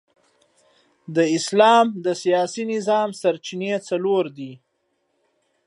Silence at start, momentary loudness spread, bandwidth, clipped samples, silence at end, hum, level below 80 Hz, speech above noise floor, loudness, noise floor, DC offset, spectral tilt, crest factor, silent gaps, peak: 1.1 s; 12 LU; 11.5 kHz; under 0.1%; 1.1 s; none; -78 dBFS; 51 dB; -20 LUFS; -71 dBFS; under 0.1%; -4.5 dB/octave; 20 dB; none; -2 dBFS